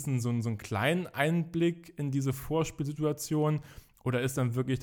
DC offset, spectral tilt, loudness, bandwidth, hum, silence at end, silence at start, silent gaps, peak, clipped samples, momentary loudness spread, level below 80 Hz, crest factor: under 0.1%; -6 dB/octave; -31 LUFS; 20 kHz; none; 0 s; 0 s; none; -12 dBFS; under 0.1%; 5 LU; -58 dBFS; 18 dB